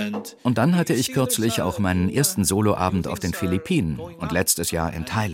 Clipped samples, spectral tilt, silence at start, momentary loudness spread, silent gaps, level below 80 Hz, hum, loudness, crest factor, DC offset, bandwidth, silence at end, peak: under 0.1%; -4.5 dB/octave; 0 s; 7 LU; none; -44 dBFS; none; -22 LUFS; 16 dB; under 0.1%; 16.5 kHz; 0 s; -6 dBFS